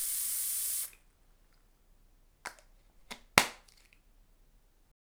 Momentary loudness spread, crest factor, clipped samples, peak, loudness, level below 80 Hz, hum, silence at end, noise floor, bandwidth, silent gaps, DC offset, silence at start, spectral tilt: 22 LU; 38 dB; under 0.1%; 0 dBFS; -31 LUFS; -62 dBFS; none; 1.5 s; -65 dBFS; over 20 kHz; none; under 0.1%; 0 s; -0.5 dB/octave